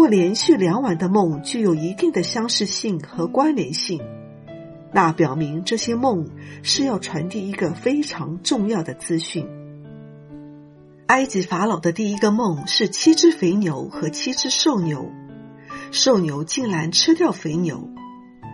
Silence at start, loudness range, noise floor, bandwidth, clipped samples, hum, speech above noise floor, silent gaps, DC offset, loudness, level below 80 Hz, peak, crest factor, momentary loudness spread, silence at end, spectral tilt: 0 s; 5 LU; -45 dBFS; 11.5 kHz; under 0.1%; none; 26 dB; none; under 0.1%; -20 LUFS; -60 dBFS; -2 dBFS; 18 dB; 21 LU; 0 s; -4 dB/octave